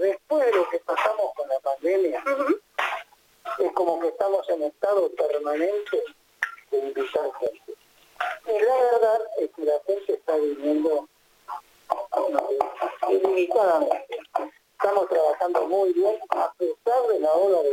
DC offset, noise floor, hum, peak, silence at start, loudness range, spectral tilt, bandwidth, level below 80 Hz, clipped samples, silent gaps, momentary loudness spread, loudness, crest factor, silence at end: under 0.1%; -47 dBFS; none; -6 dBFS; 0 s; 3 LU; -4 dB/octave; 17 kHz; -74 dBFS; under 0.1%; none; 10 LU; -24 LUFS; 18 dB; 0 s